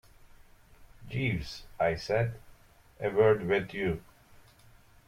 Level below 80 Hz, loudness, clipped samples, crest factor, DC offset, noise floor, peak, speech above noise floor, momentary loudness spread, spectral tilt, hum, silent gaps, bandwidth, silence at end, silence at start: -54 dBFS; -30 LUFS; under 0.1%; 22 dB; under 0.1%; -58 dBFS; -12 dBFS; 29 dB; 14 LU; -7 dB/octave; none; none; 15 kHz; 1.1 s; 0.8 s